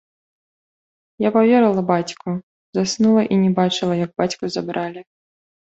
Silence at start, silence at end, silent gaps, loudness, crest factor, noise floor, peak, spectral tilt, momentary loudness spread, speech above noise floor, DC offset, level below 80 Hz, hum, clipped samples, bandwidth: 1.2 s; 0.65 s; 2.43-2.73 s; -19 LUFS; 16 dB; under -90 dBFS; -4 dBFS; -6 dB/octave; 13 LU; over 72 dB; under 0.1%; -60 dBFS; none; under 0.1%; 8 kHz